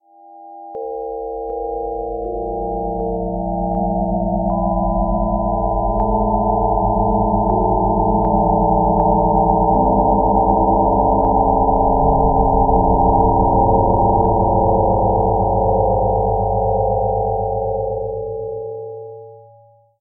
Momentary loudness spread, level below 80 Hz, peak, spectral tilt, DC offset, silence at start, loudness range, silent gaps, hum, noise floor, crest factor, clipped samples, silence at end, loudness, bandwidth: 11 LU; -26 dBFS; -2 dBFS; -16 dB/octave; under 0.1%; 0.3 s; 7 LU; none; none; -49 dBFS; 14 dB; under 0.1%; 0.6 s; -17 LUFS; 1.4 kHz